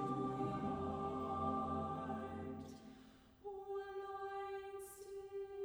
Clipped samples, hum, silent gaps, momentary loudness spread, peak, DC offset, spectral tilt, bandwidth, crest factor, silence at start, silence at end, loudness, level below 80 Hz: under 0.1%; none; none; 14 LU; -28 dBFS; under 0.1%; -7 dB/octave; over 20 kHz; 16 dB; 0 s; 0 s; -45 LUFS; -66 dBFS